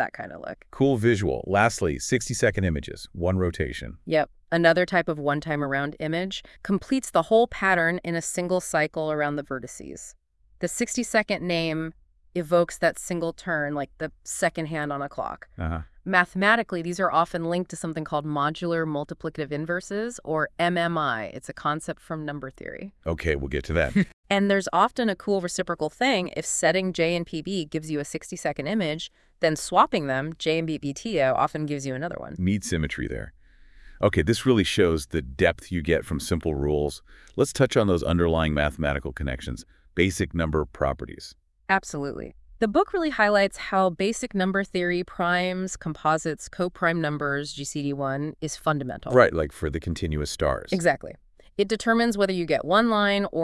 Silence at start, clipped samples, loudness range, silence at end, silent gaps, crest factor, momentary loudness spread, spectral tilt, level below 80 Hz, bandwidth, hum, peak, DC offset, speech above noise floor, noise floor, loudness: 0 s; under 0.1%; 4 LU; 0 s; 24.13-24.23 s; 22 dB; 12 LU; -5 dB/octave; -44 dBFS; 12 kHz; none; -2 dBFS; under 0.1%; 26 dB; -51 dBFS; -25 LUFS